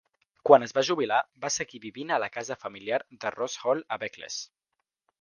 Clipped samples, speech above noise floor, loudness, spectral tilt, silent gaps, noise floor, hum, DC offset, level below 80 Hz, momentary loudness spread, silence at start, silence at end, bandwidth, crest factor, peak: under 0.1%; 56 dB; -28 LUFS; -3 dB/octave; none; -83 dBFS; none; under 0.1%; -74 dBFS; 16 LU; 0.45 s; 0.75 s; 10 kHz; 26 dB; -2 dBFS